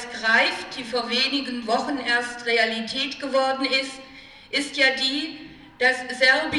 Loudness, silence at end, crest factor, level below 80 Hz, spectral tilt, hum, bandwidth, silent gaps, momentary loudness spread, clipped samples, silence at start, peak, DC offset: -22 LUFS; 0 s; 18 dB; -62 dBFS; -2 dB/octave; none; 12 kHz; none; 10 LU; under 0.1%; 0 s; -6 dBFS; under 0.1%